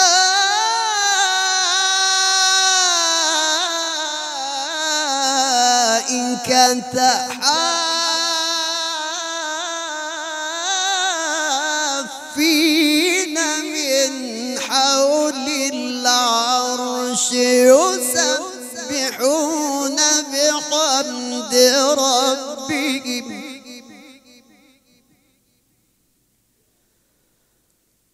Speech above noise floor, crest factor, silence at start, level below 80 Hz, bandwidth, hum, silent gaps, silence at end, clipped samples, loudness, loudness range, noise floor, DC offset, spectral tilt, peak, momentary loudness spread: 48 dB; 18 dB; 0 s; -70 dBFS; 16 kHz; none; none; 4 s; under 0.1%; -17 LUFS; 6 LU; -64 dBFS; under 0.1%; 0 dB/octave; 0 dBFS; 10 LU